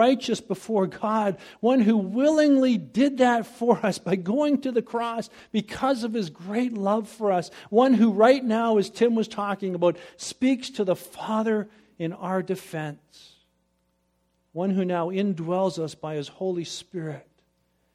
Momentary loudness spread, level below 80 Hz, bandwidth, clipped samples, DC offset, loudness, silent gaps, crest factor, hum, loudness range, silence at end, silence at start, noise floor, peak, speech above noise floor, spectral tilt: 13 LU; -68 dBFS; 14.5 kHz; under 0.1%; under 0.1%; -25 LUFS; none; 20 dB; none; 8 LU; 0.75 s; 0 s; -71 dBFS; -4 dBFS; 47 dB; -6 dB/octave